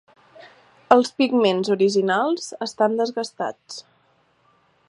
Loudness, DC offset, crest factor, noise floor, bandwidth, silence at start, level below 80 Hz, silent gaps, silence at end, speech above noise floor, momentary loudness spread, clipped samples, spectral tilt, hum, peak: -21 LUFS; under 0.1%; 22 dB; -62 dBFS; 11.5 kHz; 0.4 s; -70 dBFS; none; 1.1 s; 41 dB; 12 LU; under 0.1%; -4.5 dB/octave; none; 0 dBFS